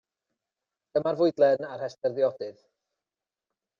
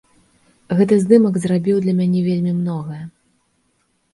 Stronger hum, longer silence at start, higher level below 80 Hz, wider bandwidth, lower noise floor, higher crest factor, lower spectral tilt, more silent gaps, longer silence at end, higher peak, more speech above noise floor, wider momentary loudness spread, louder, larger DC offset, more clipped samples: neither; first, 0.95 s vs 0.7 s; second, -76 dBFS vs -60 dBFS; second, 7 kHz vs 11.5 kHz; first, under -90 dBFS vs -65 dBFS; about the same, 20 dB vs 18 dB; second, -7 dB/octave vs -8.5 dB/octave; neither; first, 1.3 s vs 1.05 s; second, -10 dBFS vs 0 dBFS; first, over 64 dB vs 49 dB; about the same, 14 LU vs 16 LU; second, -26 LUFS vs -17 LUFS; neither; neither